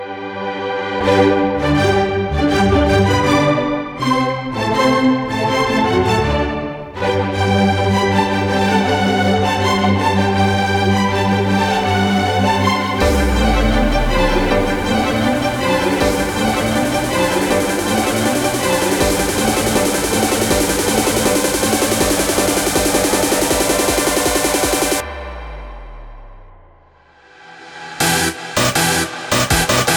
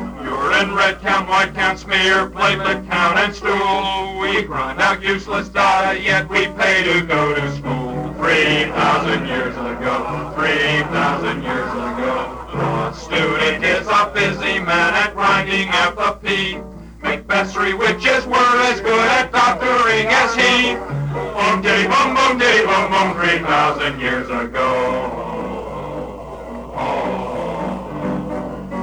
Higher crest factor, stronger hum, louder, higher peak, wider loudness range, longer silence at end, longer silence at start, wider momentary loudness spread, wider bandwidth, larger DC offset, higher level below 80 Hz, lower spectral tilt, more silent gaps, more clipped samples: about the same, 16 dB vs 16 dB; neither; about the same, -15 LUFS vs -17 LUFS; about the same, 0 dBFS vs -2 dBFS; about the same, 4 LU vs 5 LU; about the same, 0 s vs 0 s; about the same, 0 s vs 0 s; second, 5 LU vs 11 LU; about the same, over 20 kHz vs over 20 kHz; neither; first, -28 dBFS vs -40 dBFS; about the same, -4 dB/octave vs -4 dB/octave; neither; neither